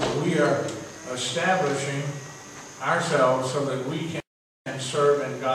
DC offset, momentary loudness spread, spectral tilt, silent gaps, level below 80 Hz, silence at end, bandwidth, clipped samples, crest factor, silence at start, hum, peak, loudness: under 0.1%; 14 LU; -4.5 dB/octave; 4.27-4.65 s; -62 dBFS; 0 s; 14 kHz; under 0.1%; 18 dB; 0 s; none; -8 dBFS; -25 LUFS